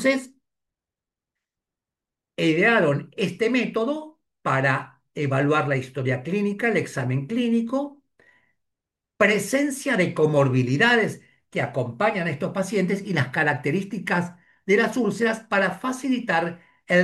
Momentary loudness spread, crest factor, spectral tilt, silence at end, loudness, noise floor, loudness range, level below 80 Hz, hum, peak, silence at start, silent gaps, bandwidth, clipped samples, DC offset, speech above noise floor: 9 LU; 18 dB; -6 dB/octave; 0 s; -23 LUFS; -89 dBFS; 3 LU; -68 dBFS; none; -6 dBFS; 0 s; none; 12.5 kHz; under 0.1%; under 0.1%; 66 dB